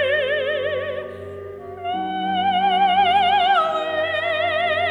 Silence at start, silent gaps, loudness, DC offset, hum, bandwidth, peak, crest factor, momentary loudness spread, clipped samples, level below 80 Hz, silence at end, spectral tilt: 0 s; none; -20 LUFS; under 0.1%; none; 10.5 kHz; -6 dBFS; 14 dB; 16 LU; under 0.1%; -62 dBFS; 0 s; -5 dB/octave